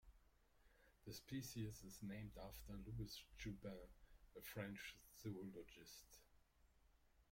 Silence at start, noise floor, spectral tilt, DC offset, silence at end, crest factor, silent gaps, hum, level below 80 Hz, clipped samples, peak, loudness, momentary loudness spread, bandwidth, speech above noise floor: 0.05 s; -76 dBFS; -5 dB/octave; under 0.1%; 0 s; 20 dB; none; none; -68 dBFS; under 0.1%; -36 dBFS; -55 LUFS; 11 LU; 16.5 kHz; 21 dB